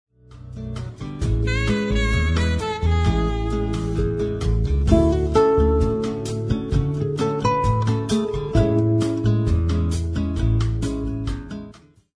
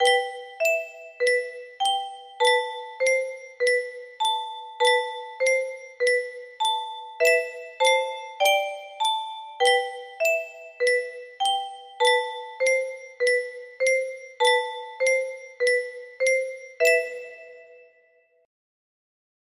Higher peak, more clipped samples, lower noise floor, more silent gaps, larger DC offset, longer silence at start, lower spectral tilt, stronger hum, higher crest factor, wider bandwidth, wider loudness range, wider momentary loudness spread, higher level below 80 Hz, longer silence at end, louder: first, -2 dBFS vs -8 dBFS; neither; second, -45 dBFS vs -62 dBFS; neither; neither; first, 0.3 s vs 0 s; first, -7 dB/octave vs 2.5 dB/octave; neither; about the same, 18 dB vs 18 dB; second, 10.5 kHz vs 15.5 kHz; about the same, 2 LU vs 1 LU; about the same, 11 LU vs 13 LU; first, -26 dBFS vs -76 dBFS; second, 0.45 s vs 1.7 s; about the same, -22 LUFS vs -24 LUFS